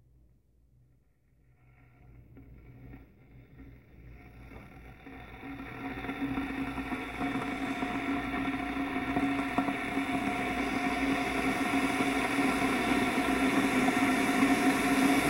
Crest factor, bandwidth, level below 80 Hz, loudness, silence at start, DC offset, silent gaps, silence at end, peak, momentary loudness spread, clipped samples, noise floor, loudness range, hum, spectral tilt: 18 dB; 16 kHz; -52 dBFS; -30 LUFS; 2.05 s; under 0.1%; none; 0 s; -14 dBFS; 21 LU; under 0.1%; -67 dBFS; 17 LU; none; -4.5 dB/octave